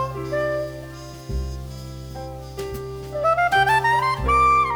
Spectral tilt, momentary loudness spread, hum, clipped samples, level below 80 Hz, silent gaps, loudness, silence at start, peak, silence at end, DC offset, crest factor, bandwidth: -5 dB/octave; 18 LU; none; under 0.1%; -36 dBFS; none; -21 LUFS; 0 s; -8 dBFS; 0 s; under 0.1%; 14 dB; over 20 kHz